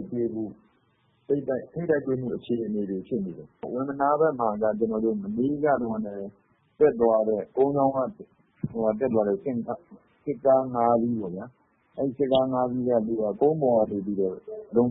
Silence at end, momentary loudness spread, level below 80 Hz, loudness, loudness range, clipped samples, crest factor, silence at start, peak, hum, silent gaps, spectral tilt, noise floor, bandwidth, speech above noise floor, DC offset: 0 s; 13 LU; -60 dBFS; -26 LUFS; 3 LU; under 0.1%; 18 dB; 0 s; -8 dBFS; none; none; -11.5 dB/octave; -67 dBFS; 4 kHz; 41 dB; under 0.1%